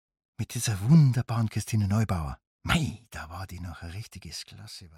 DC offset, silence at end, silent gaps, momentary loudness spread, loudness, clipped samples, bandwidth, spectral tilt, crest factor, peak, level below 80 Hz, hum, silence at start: under 0.1%; 0.1 s; 2.47-2.59 s; 20 LU; -26 LUFS; under 0.1%; 15.5 kHz; -5.5 dB/octave; 18 dB; -10 dBFS; -46 dBFS; none; 0.4 s